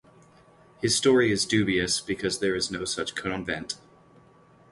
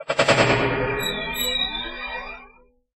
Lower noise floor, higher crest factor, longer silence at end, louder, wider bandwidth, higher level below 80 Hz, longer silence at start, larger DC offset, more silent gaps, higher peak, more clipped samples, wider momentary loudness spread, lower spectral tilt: about the same, -56 dBFS vs -53 dBFS; about the same, 20 dB vs 22 dB; first, 0.95 s vs 0.55 s; second, -25 LUFS vs -22 LUFS; second, 11.5 kHz vs 16 kHz; second, -54 dBFS vs -42 dBFS; first, 0.8 s vs 0 s; neither; neither; second, -8 dBFS vs -2 dBFS; neither; second, 11 LU vs 15 LU; about the same, -3.5 dB/octave vs -3.5 dB/octave